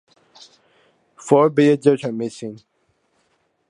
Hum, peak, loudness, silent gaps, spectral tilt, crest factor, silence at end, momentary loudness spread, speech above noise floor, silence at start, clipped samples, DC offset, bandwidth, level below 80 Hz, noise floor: none; -2 dBFS; -17 LUFS; none; -6.5 dB/octave; 20 dB; 1.15 s; 19 LU; 49 dB; 1.25 s; under 0.1%; under 0.1%; 10.5 kHz; -72 dBFS; -66 dBFS